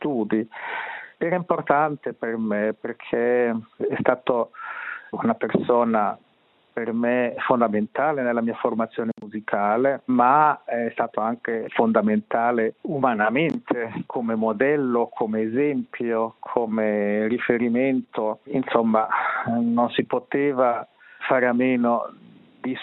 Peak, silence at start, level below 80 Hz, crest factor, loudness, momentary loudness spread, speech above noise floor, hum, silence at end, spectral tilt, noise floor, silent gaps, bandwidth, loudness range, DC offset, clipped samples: -2 dBFS; 0 s; -70 dBFS; 22 dB; -23 LUFS; 9 LU; 39 dB; none; 0 s; -5 dB/octave; -62 dBFS; none; 4.1 kHz; 3 LU; under 0.1%; under 0.1%